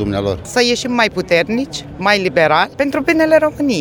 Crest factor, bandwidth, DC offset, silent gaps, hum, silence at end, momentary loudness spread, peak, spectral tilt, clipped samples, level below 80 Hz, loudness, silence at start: 14 dB; 19.5 kHz; under 0.1%; none; none; 0 s; 7 LU; 0 dBFS; -4.5 dB/octave; under 0.1%; -42 dBFS; -15 LUFS; 0 s